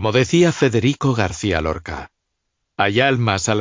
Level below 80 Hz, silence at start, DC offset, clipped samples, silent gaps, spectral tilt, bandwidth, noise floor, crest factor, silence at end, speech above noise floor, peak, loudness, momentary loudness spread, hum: -38 dBFS; 0 s; under 0.1%; under 0.1%; none; -5 dB/octave; 7.6 kHz; -75 dBFS; 14 dB; 0 s; 57 dB; -4 dBFS; -18 LUFS; 13 LU; none